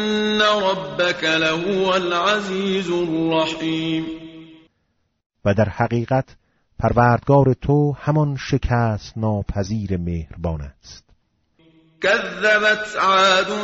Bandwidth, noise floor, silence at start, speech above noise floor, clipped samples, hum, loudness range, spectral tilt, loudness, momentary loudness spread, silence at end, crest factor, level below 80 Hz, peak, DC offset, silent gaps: 8 kHz; -69 dBFS; 0 s; 50 dB; under 0.1%; none; 5 LU; -4 dB/octave; -19 LUFS; 10 LU; 0 s; 18 dB; -40 dBFS; -2 dBFS; under 0.1%; 5.26-5.30 s